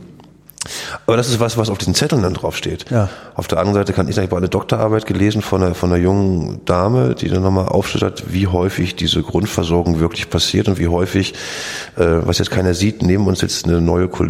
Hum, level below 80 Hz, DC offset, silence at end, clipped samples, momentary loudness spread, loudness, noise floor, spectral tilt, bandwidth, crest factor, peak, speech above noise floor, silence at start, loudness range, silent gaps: none; -36 dBFS; under 0.1%; 0 s; under 0.1%; 6 LU; -17 LUFS; -42 dBFS; -5.5 dB/octave; 16 kHz; 14 dB; -2 dBFS; 26 dB; 0 s; 2 LU; none